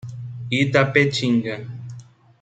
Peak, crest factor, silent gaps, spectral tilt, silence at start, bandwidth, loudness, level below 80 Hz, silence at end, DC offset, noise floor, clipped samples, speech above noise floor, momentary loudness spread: -2 dBFS; 20 dB; none; -6 dB/octave; 0.05 s; 9.2 kHz; -19 LUFS; -60 dBFS; 0.4 s; under 0.1%; -42 dBFS; under 0.1%; 23 dB; 18 LU